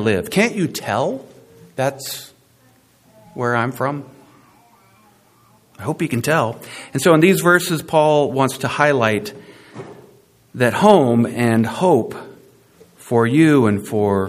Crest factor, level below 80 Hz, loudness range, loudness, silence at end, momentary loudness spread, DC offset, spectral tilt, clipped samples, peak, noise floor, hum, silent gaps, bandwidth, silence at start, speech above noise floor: 18 dB; -60 dBFS; 10 LU; -17 LUFS; 0 s; 19 LU; under 0.1%; -5.5 dB/octave; under 0.1%; 0 dBFS; -54 dBFS; none; none; 15.5 kHz; 0 s; 38 dB